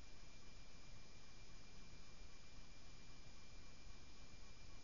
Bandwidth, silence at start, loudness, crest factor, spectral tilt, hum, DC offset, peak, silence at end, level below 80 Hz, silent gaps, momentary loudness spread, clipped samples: 7.2 kHz; 0 s; -63 LUFS; 14 dB; -3.5 dB/octave; none; 0.3%; -42 dBFS; 0 s; -64 dBFS; none; 1 LU; under 0.1%